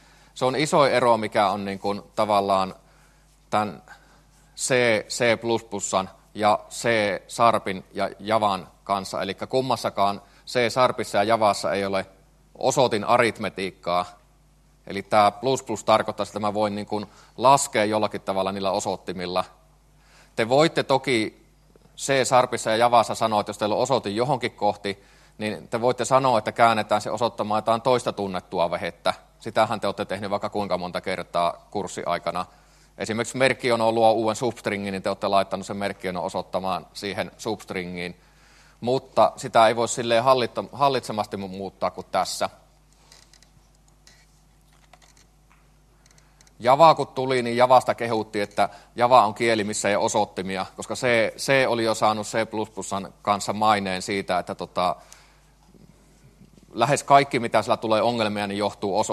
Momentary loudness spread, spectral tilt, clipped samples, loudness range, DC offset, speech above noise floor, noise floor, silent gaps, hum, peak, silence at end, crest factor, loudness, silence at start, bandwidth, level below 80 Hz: 11 LU; -4 dB/octave; under 0.1%; 6 LU; under 0.1%; 34 dB; -57 dBFS; none; none; -2 dBFS; 0 s; 22 dB; -23 LUFS; 0.35 s; 13 kHz; -60 dBFS